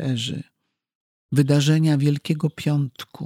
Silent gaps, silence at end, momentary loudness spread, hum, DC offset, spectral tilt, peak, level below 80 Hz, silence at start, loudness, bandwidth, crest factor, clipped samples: 0.95-1.29 s; 0 s; 11 LU; none; under 0.1%; -6.5 dB/octave; -6 dBFS; -66 dBFS; 0 s; -21 LUFS; 14.5 kHz; 16 dB; under 0.1%